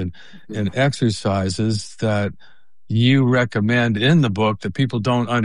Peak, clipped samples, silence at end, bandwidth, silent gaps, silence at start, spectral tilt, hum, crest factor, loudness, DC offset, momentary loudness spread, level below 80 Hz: -4 dBFS; under 0.1%; 0 s; 11 kHz; none; 0 s; -6.5 dB/octave; none; 14 dB; -19 LUFS; 1%; 8 LU; -54 dBFS